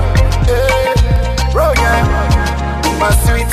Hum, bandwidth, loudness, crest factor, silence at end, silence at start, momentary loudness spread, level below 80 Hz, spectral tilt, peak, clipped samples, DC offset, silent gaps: none; 15.5 kHz; -13 LUFS; 10 dB; 0 s; 0 s; 3 LU; -14 dBFS; -5 dB/octave; 0 dBFS; under 0.1%; under 0.1%; none